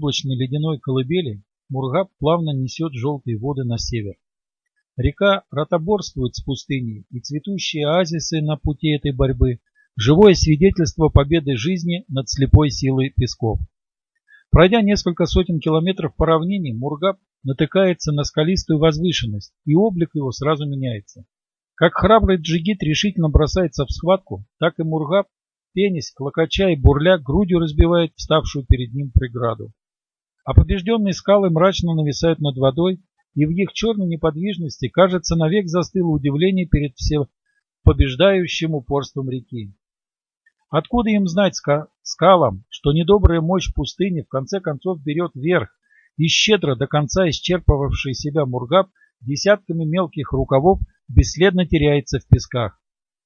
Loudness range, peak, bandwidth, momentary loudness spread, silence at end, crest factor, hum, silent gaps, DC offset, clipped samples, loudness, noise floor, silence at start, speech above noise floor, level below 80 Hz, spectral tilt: 5 LU; 0 dBFS; 7.2 kHz; 11 LU; 0.55 s; 18 dB; none; none; under 0.1%; under 0.1%; -19 LUFS; under -90 dBFS; 0 s; over 72 dB; -30 dBFS; -6 dB/octave